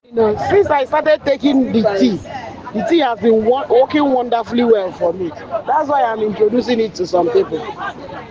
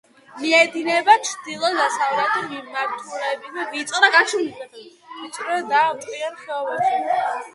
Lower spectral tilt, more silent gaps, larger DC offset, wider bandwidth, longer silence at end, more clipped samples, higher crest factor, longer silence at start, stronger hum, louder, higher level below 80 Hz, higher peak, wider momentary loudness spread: first, -6.5 dB/octave vs -1.5 dB/octave; neither; neither; second, 7.4 kHz vs 11.5 kHz; about the same, 0 s vs 0.05 s; neither; second, 14 dB vs 20 dB; second, 0.1 s vs 0.3 s; neither; first, -16 LUFS vs -20 LUFS; first, -50 dBFS vs -74 dBFS; about the same, -2 dBFS vs 0 dBFS; second, 11 LU vs 14 LU